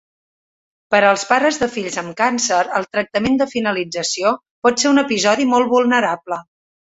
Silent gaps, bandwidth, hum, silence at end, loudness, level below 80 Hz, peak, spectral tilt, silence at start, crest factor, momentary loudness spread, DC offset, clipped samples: 4.51-4.62 s; 8 kHz; none; 0.5 s; -17 LUFS; -56 dBFS; 0 dBFS; -3 dB/octave; 0.9 s; 18 dB; 7 LU; under 0.1%; under 0.1%